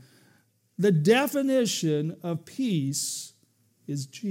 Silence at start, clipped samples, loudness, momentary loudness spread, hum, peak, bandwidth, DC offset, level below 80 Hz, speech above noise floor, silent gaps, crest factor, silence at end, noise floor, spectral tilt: 0.8 s; under 0.1%; -26 LUFS; 14 LU; none; -8 dBFS; 16.5 kHz; under 0.1%; -82 dBFS; 40 dB; none; 18 dB; 0 s; -66 dBFS; -5 dB/octave